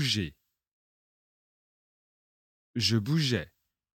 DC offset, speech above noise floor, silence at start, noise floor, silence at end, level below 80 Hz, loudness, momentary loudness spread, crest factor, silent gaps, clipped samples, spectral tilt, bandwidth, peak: under 0.1%; over 62 dB; 0 s; under -90 dBFS; 0.5 s; -62 dBFS; -29 LUFS; 13 LU; 20 dB; 0.73-2.74 s; under 0.1%; -4.5 dB/octave; 16.5 kHz; -14 dBFS